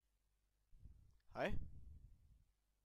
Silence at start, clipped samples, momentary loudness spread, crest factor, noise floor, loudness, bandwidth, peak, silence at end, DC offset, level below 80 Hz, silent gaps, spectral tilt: 0.75 s; under 0.1%; 22 LU; 20 dB; -84 dBFS; -48 LUFS; 12 kHz; -30 dBFS; 0.5 s; under 0.1%; -58 dBFS; none; -6.5 dB/octave